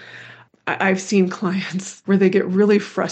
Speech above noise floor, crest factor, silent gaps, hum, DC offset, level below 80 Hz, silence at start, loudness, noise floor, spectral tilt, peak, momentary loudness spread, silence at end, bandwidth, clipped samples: 25 dB; 16 dB; none; none; under 0.1%; -72 dBFS; 0 s; -19 LUFS; -43 dBFS; -6 dB/octave; -4 dBFS; 13 LU; 0 s; 8.8 kHz; under 0.1%